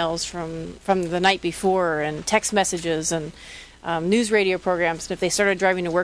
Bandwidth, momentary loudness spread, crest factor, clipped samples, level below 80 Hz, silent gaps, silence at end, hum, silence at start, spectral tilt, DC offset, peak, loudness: 11 kHz; 12 LU; 18 dB; under 0.1%; -50 dBFS; none; 0 s; none; 0 s; -3.5 dB/octave; under 0.1%; -4 dBFS; -22 LUFS